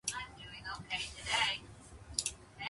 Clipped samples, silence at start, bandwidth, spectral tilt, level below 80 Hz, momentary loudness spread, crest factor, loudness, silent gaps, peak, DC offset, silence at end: under 0.1%; 0.05 s; 11.5 kHz; -0.5 dB/octave; -58 dBFS; 14 LU; 26 dB; -37 LUFS; none; -14 dBFS; under 0.1%; 0 s